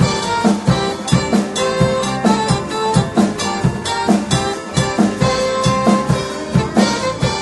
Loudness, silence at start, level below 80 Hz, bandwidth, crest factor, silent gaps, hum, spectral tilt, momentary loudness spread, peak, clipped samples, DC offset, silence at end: -16 LUFS; 0 s; -36 dBFS; 11.5 kHz; 16 dB; none; none; -5 dB/octave; 4 LU; 0 dBFS; under 0.1%; under 0.1%; 0 s